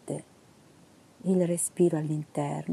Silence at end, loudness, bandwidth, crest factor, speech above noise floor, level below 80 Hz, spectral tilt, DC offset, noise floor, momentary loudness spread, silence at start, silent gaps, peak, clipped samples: 0 s; -29 LUFS; 13.5 kHz; 18 dB; 30 dB; -74 dBFS; -6.5 dB/octave; under 0.1%; -57 dBFS; 12 LU; 0.05 s; none; -12 dBFS; under 0.1%